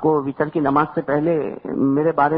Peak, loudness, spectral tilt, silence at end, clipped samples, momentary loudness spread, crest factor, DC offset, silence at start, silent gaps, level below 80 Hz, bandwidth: -4 dBFS; -20 LUFS; -12 dB/octave; 0 s; under 0.1%; 5 LU; 14 dB; under 0.1%; 0 s; none; -54 dBFS; 5 kHz